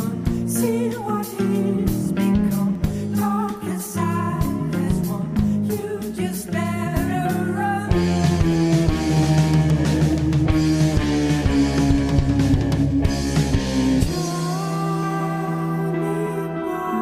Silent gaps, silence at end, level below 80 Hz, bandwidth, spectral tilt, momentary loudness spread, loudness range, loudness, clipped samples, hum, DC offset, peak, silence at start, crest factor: none; 0 s; -32 dBFS; 16 kHz; -6.5 dB/octave; 6 LU; 4 LU; -21 LUFS; under 0.1%; none; 0.1%; -6 dBFS; 0 s; 14 dB